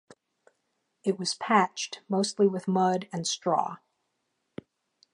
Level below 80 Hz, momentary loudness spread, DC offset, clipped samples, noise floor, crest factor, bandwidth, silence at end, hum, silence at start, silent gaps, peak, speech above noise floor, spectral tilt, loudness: -78 dBFS; 23 LU; under 0.1%; under 0.1%; -79 dBFS; 22 dB; 11 kHz; 1.4 s; none; 1.05 s; none; -6 dBFS; 52 dB; -4.5 dB/octave; -28 LUFS